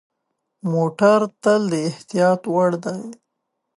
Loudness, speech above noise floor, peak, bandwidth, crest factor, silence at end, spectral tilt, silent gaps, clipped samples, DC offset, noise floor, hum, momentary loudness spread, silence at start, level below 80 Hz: -19 LUFS; 58 dB; -2 dBFS; 11.5 kHz; 18 dB; 0.65 s; -6.5 dB/octave; none; under 0.1%; under 0.1%; -77 dBFS; none; 13 LU; 0.65 s; -72 dBFS